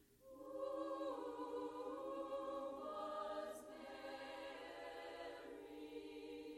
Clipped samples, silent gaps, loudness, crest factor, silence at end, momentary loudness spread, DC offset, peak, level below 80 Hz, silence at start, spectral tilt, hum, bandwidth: under 0.1%; none; -50 LUFS; 14 dB; 0 s; 8 LU; under 0.1%; -36 dBFS; -80 dBFS; 0 s; -4 dB/octave; none; 16.5 kHz